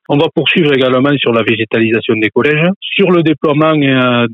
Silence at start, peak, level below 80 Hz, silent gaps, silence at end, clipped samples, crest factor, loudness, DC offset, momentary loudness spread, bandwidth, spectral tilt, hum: 0.1 s; 0 dBFS; -58 dBFS; 2.76-2.81 s; 0 s; under 0.1%; 10 dB; -11 LUFS; under 0.1%; 3 LU; 5.4 kHz; -8.5 dB/octave; none